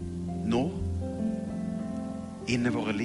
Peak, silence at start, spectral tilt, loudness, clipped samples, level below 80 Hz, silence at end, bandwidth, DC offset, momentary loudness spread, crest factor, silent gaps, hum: -14 dBFS; 0 s; -6.5 dB/octave; -31 LUFS; under 0.1%; -48 dBFS; 0 s; 11.5 kHz; under 0.1%; 7 LU; 16 dB; none; none